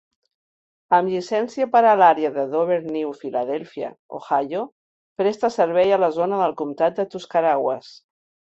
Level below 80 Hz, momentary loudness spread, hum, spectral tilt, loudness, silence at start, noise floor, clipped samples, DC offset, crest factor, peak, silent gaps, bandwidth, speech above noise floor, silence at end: -68 dBFS; 13 LU; none; -6 dB/octave; -21 LUFS; 0.9 s; under -90 dBFS; under 0.1%; under 0.1%; 18 dB; -2 dBFS; 3.99-4.09 s, 4.72-5.16 s; 8 kHz; over 70 dB; 0.55 s